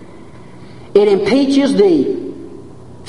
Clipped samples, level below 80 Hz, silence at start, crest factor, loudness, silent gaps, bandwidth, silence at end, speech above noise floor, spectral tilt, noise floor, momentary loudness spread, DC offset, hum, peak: under 0.1%; -50 dBFS; 0 s; 16 dB; -13 LUFS; none; 11 kHz; 0 s; 26 dB; -6 dB/octave; -37 dBFS; 18 LU; 1%; none; 0 dBFS